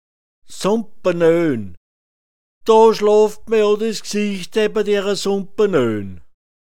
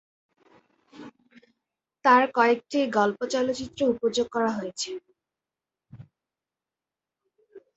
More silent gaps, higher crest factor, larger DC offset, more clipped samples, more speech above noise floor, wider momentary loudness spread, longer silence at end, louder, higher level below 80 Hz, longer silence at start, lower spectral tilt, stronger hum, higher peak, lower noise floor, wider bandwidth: first, 1.77-2.61 s vs none; second, 16 dB vs 24 dB; first, 2% vs under 0.1%; neither; first, over 74 dB vs 66 dB; about the same, 11 LU vs 12 LU; about the same, 0.25 s vs 0.15 s; first, -17 LUFS vs -24 LUFS; first, -54 dBFS vs -66 dBFS; second, 0.4 s vs 0.95 s; about the same, -5 dB/octave vs -4 dB/octave; neither; about the same, -2 dBFS vs -4 dBFS; about the same, under -90 dBFS vs -90 dBFS; first, 15 kHz vs 8.2 kHz